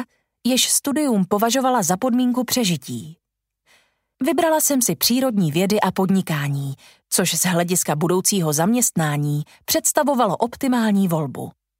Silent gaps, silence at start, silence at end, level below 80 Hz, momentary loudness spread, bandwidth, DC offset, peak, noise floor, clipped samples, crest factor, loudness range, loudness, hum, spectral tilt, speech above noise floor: none; 0 s; 0.3 s; -62 dBFS; 9 LU; 16.5 kHz; under 0.1%; -4 dBFS; -69 dBFS; under 0.1%; 16 dB; 2 LU; -19 LUFS; none; -4 dB/octave; 49 dB